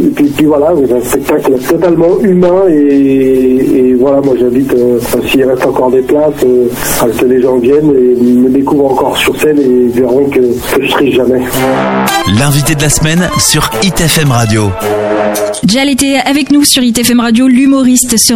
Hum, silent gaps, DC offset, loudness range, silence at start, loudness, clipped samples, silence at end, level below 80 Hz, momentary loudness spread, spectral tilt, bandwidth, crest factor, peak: none; none; under 0.1%; 1 LU; 0 s; -8 LUFS; under 0.1%; 0 s; -32 dBFS; 4 LU; -4.5 dB/octave; 17.5 kHz; 8 dB; 0 dBFS